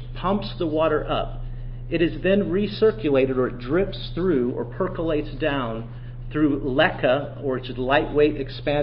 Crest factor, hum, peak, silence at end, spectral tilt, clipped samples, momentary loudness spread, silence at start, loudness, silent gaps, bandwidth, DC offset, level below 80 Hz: 18 dB; none; -4 dBFS; 0 s; -11 dB/octave; under 0.1%; 9 LU; 0 s; -23 LUFS; none; 5.6 kHz; under 0.1%; -36 dBFS